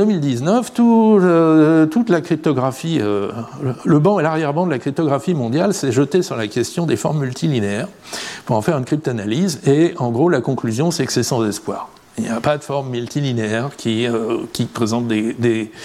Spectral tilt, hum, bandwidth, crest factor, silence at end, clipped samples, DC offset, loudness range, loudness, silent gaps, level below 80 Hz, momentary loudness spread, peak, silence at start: -6 dB/octave; none; 15 kHz; 14 dB; 0 s; under 0.1%; under 0.1%; 5 LU; -18 LUFS; none; -58 dBFS; 10 LU; -2 dBFS; 0 s